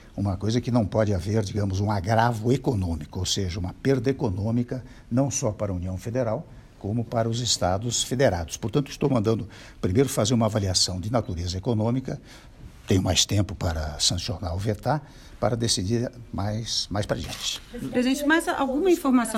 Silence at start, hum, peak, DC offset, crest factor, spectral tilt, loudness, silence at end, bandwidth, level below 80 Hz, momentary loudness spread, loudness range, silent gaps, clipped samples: 0 s; none; -6 dBFS; under 0.1%; 20 dB; -4.5 dB/octave; -25 LUFS; 0 s; 16 kHz; -44 dBFS; 8 LU; 3 LU; none; under 0.1%